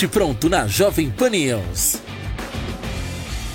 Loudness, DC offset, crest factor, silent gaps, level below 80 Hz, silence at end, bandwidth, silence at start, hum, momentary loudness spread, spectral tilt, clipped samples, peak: -21 LUFS; under 0.1%; 16 dB; none; -34 dBFS; 0 s; 17 kHz; 0 s; none; 11 LU; -4 dB/octave; under 0.1%; -6 dBFS